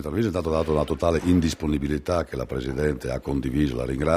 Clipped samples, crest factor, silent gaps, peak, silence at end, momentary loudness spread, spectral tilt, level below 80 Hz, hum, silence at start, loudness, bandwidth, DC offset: under 0.1%; 18 dB; none; -6 dBFS; 0 s; 6 LU; -7 dB/octave; -38 dBFS; none; 0 s; -25 LUFS; 16 kHz; under 0.1%